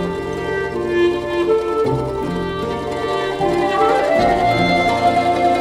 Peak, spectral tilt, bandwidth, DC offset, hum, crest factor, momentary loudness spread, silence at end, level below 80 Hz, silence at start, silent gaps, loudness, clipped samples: -4 dBFS; -6 dB/octave; 15 kHz; under 0.1%; none; 14 dB; 7 LU; 0 s; -40 dBFS; 0 s; none; -18 LUFS; under 0.1%